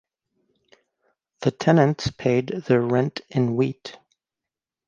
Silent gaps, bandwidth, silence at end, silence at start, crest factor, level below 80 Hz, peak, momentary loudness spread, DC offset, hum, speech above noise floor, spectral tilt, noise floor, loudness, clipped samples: none; 7.4 kHz; 0.95 s; 1.4 s; 20 dB; -56 dBFS; -4 dBFS; 9 LU; under 0.1%; none; 67 dB; -7 dB/octave; -88 dBFS; -22 LUFS; under 0.1%